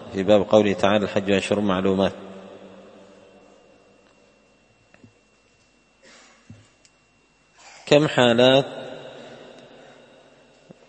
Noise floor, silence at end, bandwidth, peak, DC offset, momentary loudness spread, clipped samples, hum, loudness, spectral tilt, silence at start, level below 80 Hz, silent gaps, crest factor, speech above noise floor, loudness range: -60 dBFS; 1.55 s; 8.8 kHz; 0 dBFS; under 0.1%; 26 LU; under 0.1%; none; -19 LUFS; -5.5 dB/octave; 0 s; -60 dBFS; none; 24 dB; 42 dB; 7 LU